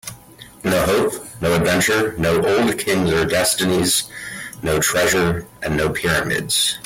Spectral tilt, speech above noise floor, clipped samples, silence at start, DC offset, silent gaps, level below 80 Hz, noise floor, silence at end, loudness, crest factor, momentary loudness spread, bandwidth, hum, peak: -3.5 dB/octave; 24 dB; under 0.1%; 0.05 s; under 0.1%; none; -42 dBFS; -42 dBFS; 0 s; -18 LUFS; 12 dB; 9 LU; 17 kHz; none; -6 dBFS